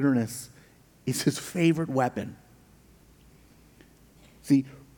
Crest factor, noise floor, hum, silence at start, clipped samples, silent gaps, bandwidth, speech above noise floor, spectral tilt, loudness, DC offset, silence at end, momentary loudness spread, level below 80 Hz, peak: 18 dB; -56 dBFS; none; 0 s; under 0.1%; none; 19.5 kHz; 30 dB; -5.5 dB/octave; -27 LUFS; under 0.1%; 0.2 s; 16 LU; -62 dBFS; -10 dBFS